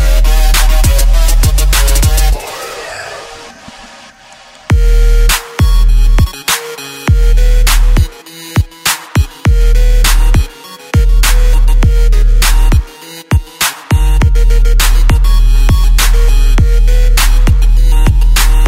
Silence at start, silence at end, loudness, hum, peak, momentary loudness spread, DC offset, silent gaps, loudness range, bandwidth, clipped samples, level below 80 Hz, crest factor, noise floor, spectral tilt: 0 s; 0 s; -12 LUFS; none; 0 dBFS; 12 LU; under 0.1%; none; 4 LU; 16.5 kHz; under 0.1%; -8 dBFS; 8 dB; -37 dBFS; -4 dB/octave